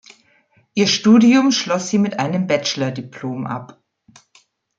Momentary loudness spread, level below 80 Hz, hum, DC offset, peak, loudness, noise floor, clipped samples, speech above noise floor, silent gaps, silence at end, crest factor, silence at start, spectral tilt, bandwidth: 16 LU; -64 dBFS; none; under 0.1%; -2 dBFS; -17 LUFS; -58 dBFS; under 0.1%; 41 dB; none; 1.1 s; 16 dB; 0.75 s; -4.5 dB/octave; 7.8 kHz